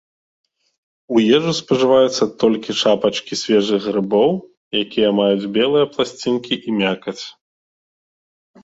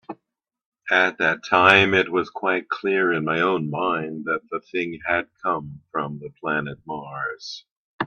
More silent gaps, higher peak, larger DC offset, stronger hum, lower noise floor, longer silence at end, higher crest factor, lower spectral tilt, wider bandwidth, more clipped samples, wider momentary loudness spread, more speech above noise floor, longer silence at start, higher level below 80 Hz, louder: second, 4.57-4.71 s vs 0.66-0.72 s, 7.72-7.99 s; about the same, -2 dBFS vs 0 dBFS; neither; neither; first, under -90 dBFS vs -79 dBFS; first, 1.35 s vs 0 s; second, 16 dB vs 22 dB; about the same, -5 dB/octave vs -5.5 dB/octave; second, 8 kHz vs 10 kHz; neither; second, 8 LU vs 16 LU; first, over 73 dB vs 57 dB; first, 1.1 s vs 0.1 s; about the same, -60 dBFS vs -64 dBFS; first, -17 LUFS vs -22 LUFS